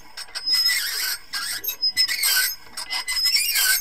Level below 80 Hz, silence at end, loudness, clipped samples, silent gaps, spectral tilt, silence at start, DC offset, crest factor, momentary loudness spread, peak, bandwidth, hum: -56 dBFS; 0 s; -20 LUFS; under 0.1%; none; 3.5 dB/octave; 0.15 s; 0.7%; 16 dB; 10 LU; -6 dBFS; 16 kHz; none